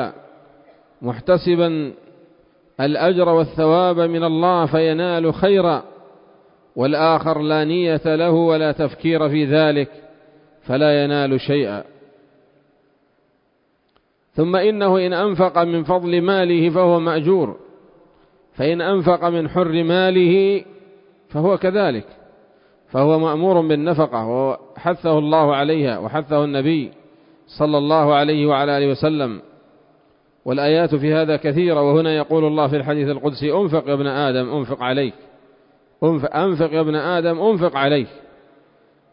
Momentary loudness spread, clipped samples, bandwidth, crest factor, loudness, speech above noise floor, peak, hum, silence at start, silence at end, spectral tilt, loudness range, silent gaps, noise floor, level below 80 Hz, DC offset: 8 LU; under 0.1%; 5.4 kHz; 16 dB; -18 LUFS; 46 dB; -2 dBFS; none; 0 s; 0.95 s; -12 dB/octave; 4 LU; none; -63 dBFS; -56 dBFS; under 0.1%